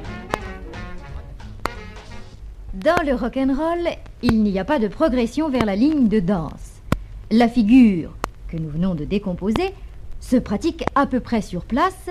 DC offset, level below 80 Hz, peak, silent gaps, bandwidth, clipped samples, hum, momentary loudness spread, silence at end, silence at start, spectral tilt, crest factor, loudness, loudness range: under 0.1%; -36 dBFS; 0 dBFS; none; 13.5 kHz; under 0.1%; none; 20 LU; 0 s; 0 s; -7 dB/octave; 20 dB; -20 LUFS; 6 LU